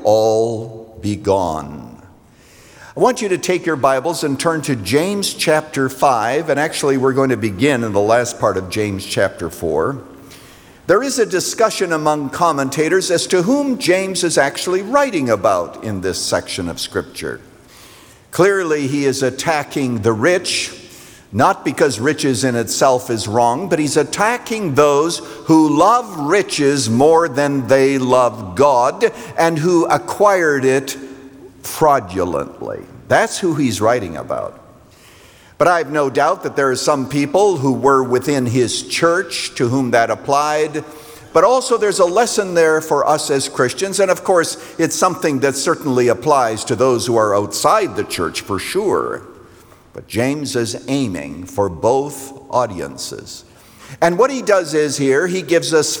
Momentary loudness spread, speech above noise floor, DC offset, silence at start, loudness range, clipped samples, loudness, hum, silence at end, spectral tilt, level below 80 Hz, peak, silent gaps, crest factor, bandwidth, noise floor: 10 LU; 30 dB; under 0.1%; 0 s; 6 LU; under 0.1%; -16 LUFS; none; 0 s; -4.5 dB/octave; -54 dBFS; -2 dBFS; none; 16 dB; over 20 kHz; -46 dBFS